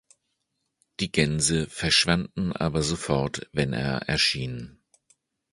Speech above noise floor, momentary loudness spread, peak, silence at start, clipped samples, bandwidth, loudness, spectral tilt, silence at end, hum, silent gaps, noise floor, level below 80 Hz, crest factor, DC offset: 53 dB; 12 LU; -6 dBFS; 1 s; under 0.1%; 11.5 kHz; -25 LUFS; -3.5 dB/octave; 0.8 s; none; none; -78 dBFS; -46 dBFS; 22 dB; under 0.1%